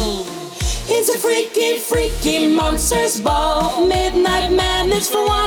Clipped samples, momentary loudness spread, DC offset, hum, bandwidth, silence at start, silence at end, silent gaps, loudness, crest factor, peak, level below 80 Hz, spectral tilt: under 0.1%; 7 LU; under 0.1%; none; over 20 kHz; 0 s; 0 s; none; -17 LUFS; 10 dB; -6 dBFS; -28 dBFS; -3.5 dB/octave